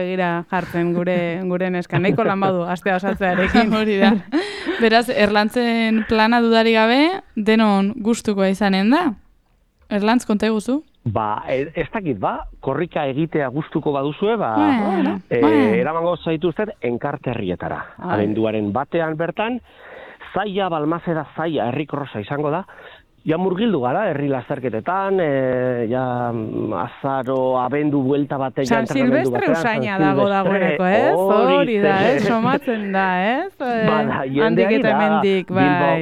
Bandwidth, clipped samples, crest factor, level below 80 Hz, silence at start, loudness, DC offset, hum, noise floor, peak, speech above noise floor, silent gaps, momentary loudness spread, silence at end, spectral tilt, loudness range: 14 kHz; under 0.1%; 18 dB; -48 dBFS; 0 s; -19 LUFS; under 0.1%; none; -58 dBFS; -2 dBFS; 40 dB; none; 9 LU; 0 s; -6.5 dB/octave; 6 LU